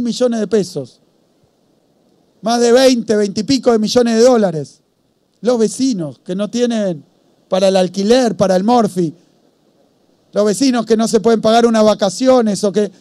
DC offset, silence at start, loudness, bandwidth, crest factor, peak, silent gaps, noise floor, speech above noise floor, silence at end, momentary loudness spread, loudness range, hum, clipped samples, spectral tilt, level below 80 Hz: under 0.1%; 0 s; -14 LUFS; 13.5 kHz; 14 dB; 0 dBFS; none; -60 dBFS; 47 dB; 0.1 s; 12 LU; 3 LU; none; under 0.1%; -5 dB/octave; -54 dBFS